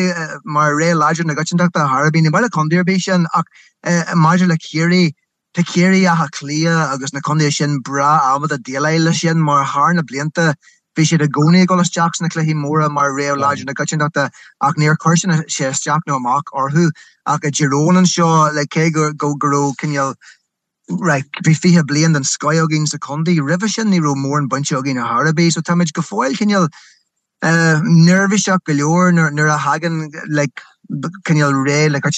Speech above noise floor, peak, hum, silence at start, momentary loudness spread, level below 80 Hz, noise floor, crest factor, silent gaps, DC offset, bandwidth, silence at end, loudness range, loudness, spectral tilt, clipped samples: 42 dB; -2 dBFS; none; 0 s; 8 LU; -66 dBFS; -56 dBFS; 14 dB; none; under 0.1%; 9.2 kHz; 0 s; 2 LU; -15 LUFS; -5 dB/octave; under 0.1%